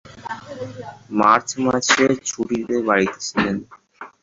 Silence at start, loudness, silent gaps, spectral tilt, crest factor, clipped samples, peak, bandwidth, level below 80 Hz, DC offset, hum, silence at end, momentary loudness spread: 0.05 s; -19 LUFS; none; -3.5 dB/octave; 20 dB; under 0.1%; 0 dBFS; 8 kHz; -54 dBFS; under 0.1%; none; 0.15 s; 17 LU